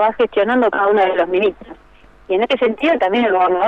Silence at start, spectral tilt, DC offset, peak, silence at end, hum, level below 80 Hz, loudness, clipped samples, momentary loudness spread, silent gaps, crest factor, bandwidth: 0 s; -6 dB/octave; under 0.1%; -6 dBFS; 0 s; none; -50 dBFS; -16 LUFS; under 0.1%; 4 LU; none; 10 dB; 7 kHz